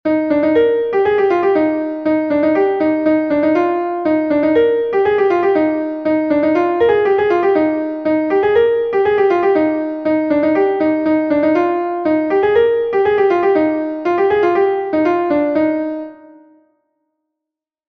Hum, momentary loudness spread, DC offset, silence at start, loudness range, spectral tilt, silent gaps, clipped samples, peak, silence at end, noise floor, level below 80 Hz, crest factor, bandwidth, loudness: none; 5 LU; under 0.1%; 0.05 s; 2 LU; -7.5 dB/octave; none; under 0.1%; -2 dBFS; 1.75 s; -84 dBFS; -52 dBFS; 12 dB; 5.8 kHz; -15 LUFS